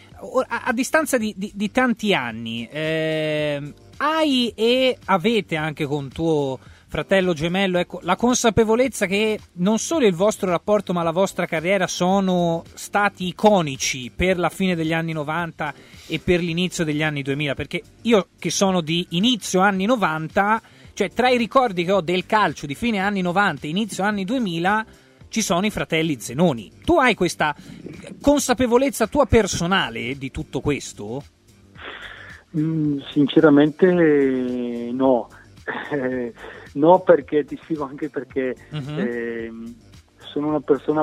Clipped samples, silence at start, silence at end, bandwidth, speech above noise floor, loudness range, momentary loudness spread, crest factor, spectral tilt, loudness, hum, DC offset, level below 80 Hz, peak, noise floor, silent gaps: under 0.1%; 0.15 s; 0 s; 16 kHz; 26 dB; 4 LU; 12 LU; 20 dB; -5 dB/octave; -21 LUFS; none; under 0.1%; -46 dBFS; 0 dBFS; -46 dBFS; none